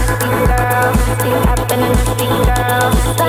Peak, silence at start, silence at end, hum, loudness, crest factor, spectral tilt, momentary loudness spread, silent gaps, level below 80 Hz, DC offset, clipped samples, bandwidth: 0 dBFS; 0 s; 0 s; none; -14 LUFS; 12 dB; -5 dB/octave; 2 LU; none; -18 dBFS; under 0.1%; under 0.1%; 17.5 kHz